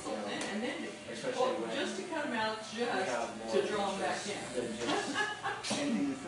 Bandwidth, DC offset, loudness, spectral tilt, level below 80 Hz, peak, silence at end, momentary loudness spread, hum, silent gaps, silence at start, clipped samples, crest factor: 11.5 kHz; under 0.1%; -35 LUFS; -3.5 dB/octave; -70 dBFS; -18 dBFS; 0 s; 5 LU; none; none; 0 s; under 0.1%; 16 dB